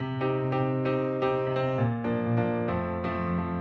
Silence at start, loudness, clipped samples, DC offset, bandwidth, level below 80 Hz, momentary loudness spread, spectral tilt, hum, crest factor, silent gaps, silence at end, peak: 0 s; -28 LUFS; under 0.1%; under 0.1%; 5.6 kHz; -58 dBFS; 3 LU; -9.5 dB/octave; none; 14 dB; none; 0 s; -14 dBFS